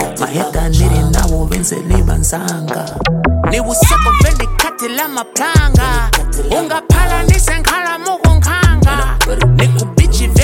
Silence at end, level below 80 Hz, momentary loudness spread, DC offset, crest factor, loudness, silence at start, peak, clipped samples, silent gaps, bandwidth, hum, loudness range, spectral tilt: 0 s; -16 dBFS; 7 LU; under 0.1%; 12 dB; -13 LUFS; 0 s; 0 dBFS; under 0.1%; none; 17 kHz; none; 2 LU; -4.5 dB/octave